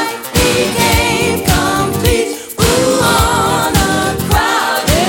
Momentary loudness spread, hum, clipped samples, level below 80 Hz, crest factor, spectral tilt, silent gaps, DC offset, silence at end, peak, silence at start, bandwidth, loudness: 4 LU; none; under 0.1%; -24 dBFS; 12 dB; -4 dB/octave; none; under 0.1%; 0 s; 0 dBFS; 0 s; 17 kHz; -12 LUFS